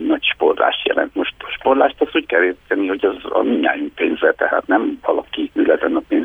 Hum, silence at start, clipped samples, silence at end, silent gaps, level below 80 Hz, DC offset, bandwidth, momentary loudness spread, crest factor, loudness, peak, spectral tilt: none; 0 s; under 0.1%; 0 s; none; -52 dBFS; under 0.1%; 3.8 kHz; 5 LU; 16 dB; -18 LUFS; 0 dBFS; -6 dB/octave